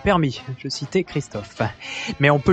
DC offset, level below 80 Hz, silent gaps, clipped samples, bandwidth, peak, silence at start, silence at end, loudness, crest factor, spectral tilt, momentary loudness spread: under 0.1%; -44 dBFS; none; under 0.1%; 8.8 kHz; -4 dBFS; 0 s; 0 s; -23 LUFS; 18 dB; -6 dB/octave; 11 LU